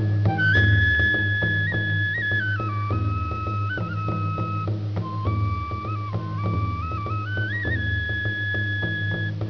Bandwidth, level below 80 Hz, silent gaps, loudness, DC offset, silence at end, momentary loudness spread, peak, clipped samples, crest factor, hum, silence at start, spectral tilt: 5.4 kHz; -38 dBFS; none; -24 LUFS; 0.3%; 0 s; 9 LU; -8 dBFS; under 0.1%; 16 dB; none; 0 s; -7.5 dB/octave